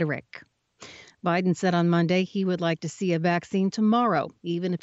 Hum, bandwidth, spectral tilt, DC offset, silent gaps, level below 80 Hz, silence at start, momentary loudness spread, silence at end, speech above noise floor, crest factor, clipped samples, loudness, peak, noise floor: none; 8 kHz; -6.5 dB/octave; under 0.1%; none; -70 dBFS; 0 s; 10 LU; 0.05 s; 24 dB; 14 dB; under 0.1%; -25 LUFS; -10 dBFS; -49 dBFS